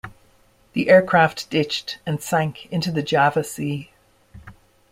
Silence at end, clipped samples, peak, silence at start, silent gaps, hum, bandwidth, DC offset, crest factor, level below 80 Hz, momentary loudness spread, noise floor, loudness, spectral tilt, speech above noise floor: 0.4 s; under 0.1%; -2 dBFS; 0.05 s; none; none; 16 kHz; under 0.1%; 20 dB; -56 dBFS; 13 LU; -57 dBFS; -20 LUFS; -5 dB/octave; 37 dB